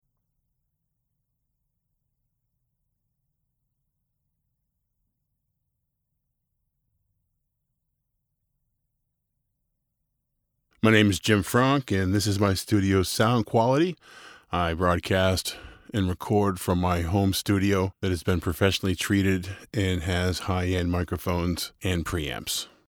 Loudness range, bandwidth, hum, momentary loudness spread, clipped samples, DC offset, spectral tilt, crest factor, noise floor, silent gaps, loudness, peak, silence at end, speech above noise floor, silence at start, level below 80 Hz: 4 LU; over 20 kHz; none; 8 LU; under 0.1%; under 0.1%; -5.5 dB/octave; 22 dB; -79 dBFS; none; -25 LUFS; -4 dBFS; 0.25 s; 54 dB; 10.85 s; -52 dBFS